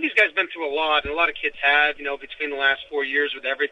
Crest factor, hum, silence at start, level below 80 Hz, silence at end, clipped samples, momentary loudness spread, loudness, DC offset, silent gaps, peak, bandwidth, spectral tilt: 18 dB; none; 0 s; -52 dBFS; 0.05 s; under 0.1%; 10 LU; -21 LUFS; under 0.1%; none; -4 dBFS; 10 kHz; -3.5 dB/octave